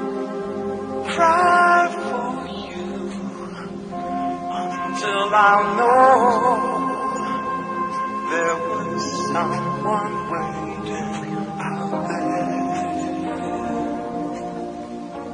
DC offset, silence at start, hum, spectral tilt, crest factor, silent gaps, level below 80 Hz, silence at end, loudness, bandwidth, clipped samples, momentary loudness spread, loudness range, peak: under 0.1%; 0 s; none; -5 dB/octave; 20 dB; none; -56 dBFS; 0 s; -21 LUFS; 10.5 kHz; under 0.1%; 15 LU; 8 LU; -2 dBFS